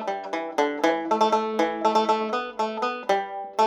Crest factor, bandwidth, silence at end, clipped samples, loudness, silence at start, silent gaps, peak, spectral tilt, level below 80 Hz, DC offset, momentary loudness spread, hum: 18 dB; 15 kHz; 0 s; under 0.1%; -25 LUFS; 0 s; none; -6 dBFS; -4 dB/octave; -72 dBFS; under 0.1%; 7 LU; none